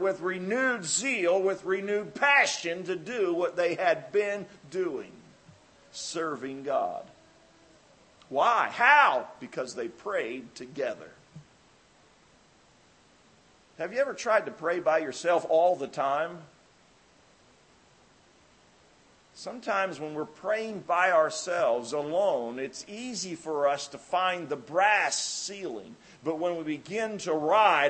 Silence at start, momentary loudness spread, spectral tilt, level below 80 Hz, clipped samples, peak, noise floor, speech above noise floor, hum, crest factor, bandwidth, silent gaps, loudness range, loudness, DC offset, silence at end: 0 s; 14 LU; -2.5 dB/octave; -76 dBFS; under 0.1%; -6 dBFS; -61 dBFS; 33 dB; none; 24 dB; 8.8 kHz; none; 11 LU; -28 LUFS; under 0.1%; 0 s